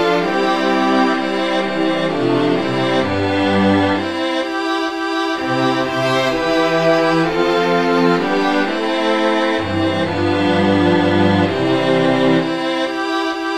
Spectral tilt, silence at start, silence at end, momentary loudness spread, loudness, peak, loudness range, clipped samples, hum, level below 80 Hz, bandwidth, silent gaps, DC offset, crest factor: -6 dB/octave; 0 s; 0 s; 5 LU; -16 LUFS; 0 dBFS; 2 LU; under 0.1%; none; -50 dBFS; 12.5 kHz; none; 0.9%; 14 dB